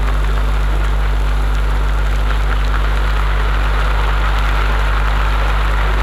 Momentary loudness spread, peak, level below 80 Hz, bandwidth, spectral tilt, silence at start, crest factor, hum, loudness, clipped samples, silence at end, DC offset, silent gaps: 1 LU; -2 dBFS; -14 dBFS; 11.5 kHz; -5.5 dB/octave; 0 s; 12 dB; 50 Hz at -15 dBFS; -17 LUFS; under 0.1%; 0 s; under 0.1%; none